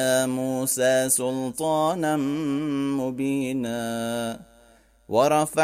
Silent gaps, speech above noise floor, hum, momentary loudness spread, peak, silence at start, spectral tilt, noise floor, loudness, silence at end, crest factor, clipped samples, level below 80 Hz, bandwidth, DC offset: none; 32 dB; none; 7 LU; -8 dBFS; 0 s; -4 dB/octave; -56 dBFS; -24 LUFS; 0 s; 16 dB; under 0.1%; -62 dBFS; 16 kHz; under 0.1%